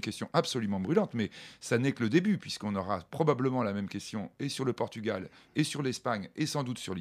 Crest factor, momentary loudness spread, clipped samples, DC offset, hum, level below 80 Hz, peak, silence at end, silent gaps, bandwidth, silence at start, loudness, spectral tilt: 22 dB; 9 LU; under 0.1%; under 0.1%; none; -70 dBFS; -10 dBFS; 0 s; none; 15.5 kHz; 0 s; -32 LUFS; -5.5 dB/octave